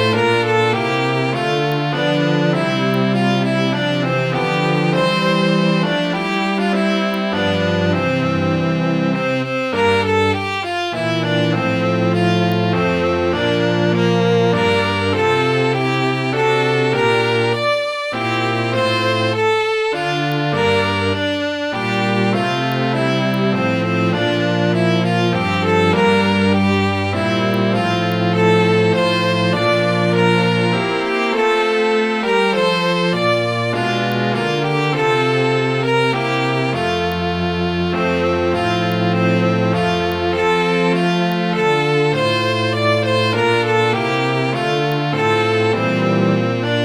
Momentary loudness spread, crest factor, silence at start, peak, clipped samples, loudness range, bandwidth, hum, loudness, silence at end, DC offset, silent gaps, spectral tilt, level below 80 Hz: 3 LU; 14 dB; 0 s; -2 dBFS; under 0.1%; 2 LU; 13.5 kHz; none; -17 LUFS; 0 s; under 0.1%; none; -6 dB/octave; -50 dBFS